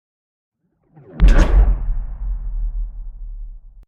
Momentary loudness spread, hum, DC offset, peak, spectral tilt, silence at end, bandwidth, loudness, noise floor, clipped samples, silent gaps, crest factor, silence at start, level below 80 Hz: 22 LU; none; under 0.1%; 0 dBFS; -7 dB/octave; 0.05 s; 7 kHz; -20 LUFS; -52 dBFS; under 0.1%; none; 18 dB; 1.15 s; -18 dBFS